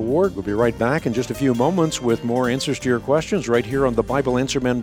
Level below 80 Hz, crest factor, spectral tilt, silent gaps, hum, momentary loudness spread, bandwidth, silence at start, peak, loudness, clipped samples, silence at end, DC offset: -42 dBFS; 14 dB; -5.5 dB/octave; none; none; 3 LU; 17.5 kHz; 0 s; -4 dBFS; -20 LUFS; under 0.1%; 0 s; under 0.1%